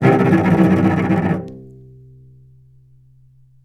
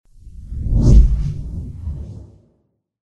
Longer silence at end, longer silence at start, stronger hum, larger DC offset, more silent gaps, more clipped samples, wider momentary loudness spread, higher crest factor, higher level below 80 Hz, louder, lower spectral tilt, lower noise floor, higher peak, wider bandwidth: first, 1.95 s vs 0.9 s; second, 0 s vs 0.25 s; neither; neither; neither; neither; second, 16 LU vs 21 LU; about the same, 18 dB vs 16 dB; second, -50 dBFS vs -18 dBFS; first, -15 LUFS vs -18 LUFS; about the same, -9 dB/octave vs -9 dB/octave; second, -50 dBFS vs -65 dBFS; about the same, 0 dBFS vs 0 dBFS; first, 8.2 kHz vs 7 kHz